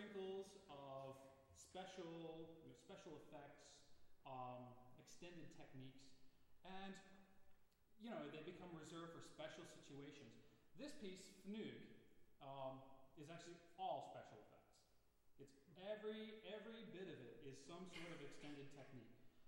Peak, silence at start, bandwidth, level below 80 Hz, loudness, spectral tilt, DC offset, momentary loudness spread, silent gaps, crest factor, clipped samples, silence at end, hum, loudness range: -38 dBFS; 0 s; 16 kHz; -82 dBFS; -58 LUFS; -5 dB/octave; under 0.1%; 12 LU; none; 20 dB; under 0.1%; 0 s; none; 5 LU